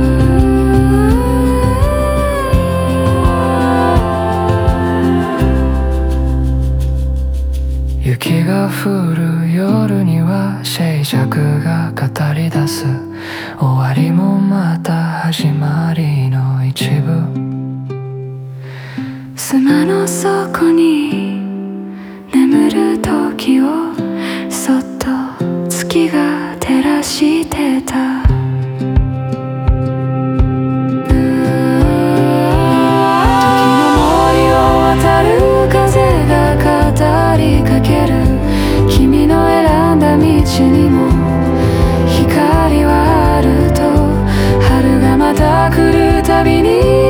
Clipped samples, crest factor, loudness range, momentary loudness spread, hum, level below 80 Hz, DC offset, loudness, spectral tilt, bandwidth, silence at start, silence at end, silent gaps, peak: under 0.1%; 12 dB; 6 LU; 9 LU; none; -20 dBFS; under 0.1%; -12 LUFS; -6.5 dB/octave; over 20 kHz; 0 s; 0 s; none; 0 dBFS